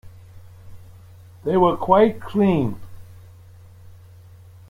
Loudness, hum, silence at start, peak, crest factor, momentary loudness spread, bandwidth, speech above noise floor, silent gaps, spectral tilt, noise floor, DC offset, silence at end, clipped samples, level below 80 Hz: -19 LUFS; none; 0.05 s; -2 dBFS; 20 dB; 13 LU; 15.5 kHz; 27 dB; none; -8.5 dB/octave; -45 dBFS; under 0.1%; 1.55 s; under 0.1%; -48 dBFS